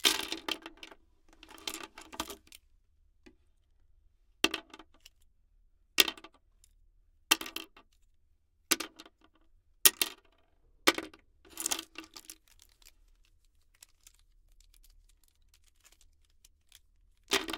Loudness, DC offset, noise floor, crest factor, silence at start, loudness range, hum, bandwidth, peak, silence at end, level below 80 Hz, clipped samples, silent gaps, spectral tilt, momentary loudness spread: -31 LUFS; under 0.1%; -69 dBFS; 38 dB; 0.05 s; 13 LU; none; 18 kHz; 0 dBFS; 0 s; -66 dBFS; under 0.1%; none; 0.5 dB/octave; 26 LU